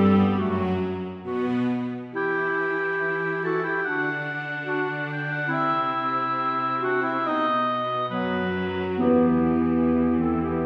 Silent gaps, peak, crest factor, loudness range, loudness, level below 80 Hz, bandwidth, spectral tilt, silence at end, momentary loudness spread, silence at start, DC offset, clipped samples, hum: none; -8 dBFS; 16 dB; 3 LU; -24 LUFS; -52 dBFS; 5.8 kHz; -8.5 dB/octave; 0 s; 7 LU; 0 s; under 0.1%; under 0.1%; none